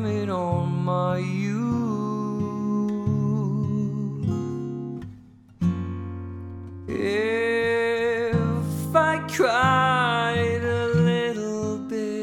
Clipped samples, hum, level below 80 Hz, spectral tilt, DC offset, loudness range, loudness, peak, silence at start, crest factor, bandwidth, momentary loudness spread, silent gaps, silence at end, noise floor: under 0.1%; none; -54 dBFS; -6.5 dB/octave; under 0.1%; 7 LU; -24 LUFS; -6 dBFS; 0 s; 18 dB; 17.5 kHz; 11 LU; none; 0 s; -48 dBFS